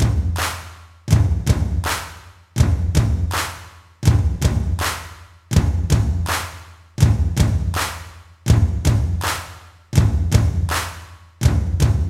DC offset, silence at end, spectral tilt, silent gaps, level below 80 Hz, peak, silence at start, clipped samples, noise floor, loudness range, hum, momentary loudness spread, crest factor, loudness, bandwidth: under 0.1%; 0 s; -5.5 dB/octave; none; -24 dBFS; 0 dBFS; 0 s; under 0.1%; -40 dBFS; 1 LU; none; 15 LU; 18 dB; -20 LUFS; 16.5 kHz